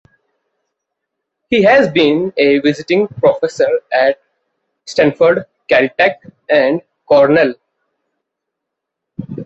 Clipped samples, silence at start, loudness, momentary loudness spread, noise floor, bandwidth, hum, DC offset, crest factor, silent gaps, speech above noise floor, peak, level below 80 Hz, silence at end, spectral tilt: under 0.1%; 1.5 s; -13 LUFS; 11 LU; -78 dBFS; 8 kHz; none; under 0.1%; 14 dB; none; 66 dB; 0 dBFS; -54 dBFS; 0 s; -6 dB/octave